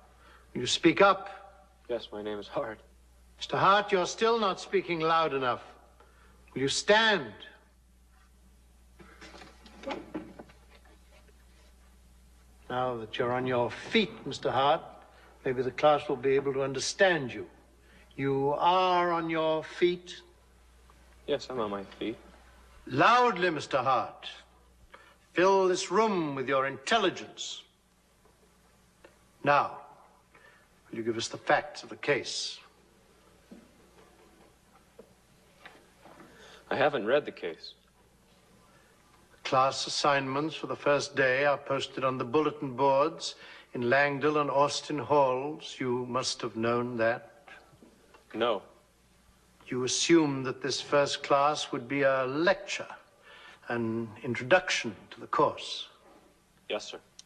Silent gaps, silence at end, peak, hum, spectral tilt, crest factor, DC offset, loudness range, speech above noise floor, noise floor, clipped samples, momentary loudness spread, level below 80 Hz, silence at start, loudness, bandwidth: none; 0.25 s; -8 dBFS; none; -4 dB/octave; 22 dB; under 0.1%; 7 LU; 37 dB; -65 dBFS; under 0.1%; 18 LU; -64 dBFS; 0.55 s; -29 LUFS; 12 kHz